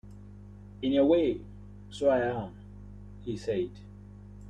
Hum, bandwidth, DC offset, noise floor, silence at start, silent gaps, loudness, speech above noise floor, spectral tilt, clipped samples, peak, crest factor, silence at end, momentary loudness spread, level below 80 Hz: 50 Hz at -45 dBFS; 9.8 kHz; under 0.1%; -48 dBFS; 0.05 s; none; -29 LUFS; 20 dB; -7 dB/octave; under 0.1%; -12 dBFS; 18 dB; 0 s; 25 LU; -52 dBFS